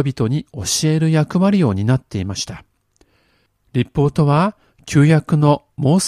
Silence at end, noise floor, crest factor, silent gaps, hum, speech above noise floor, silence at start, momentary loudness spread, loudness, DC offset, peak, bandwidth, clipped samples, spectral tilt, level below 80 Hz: 0 s; -61 dBFS; 16 dB; none; none; 45 dB; 0 s; 10 LU; -17 LUFS; under 0.1%; 0 dBFS; 14 kHz; under 0.1%; -6 dB/octave; -46 dBFS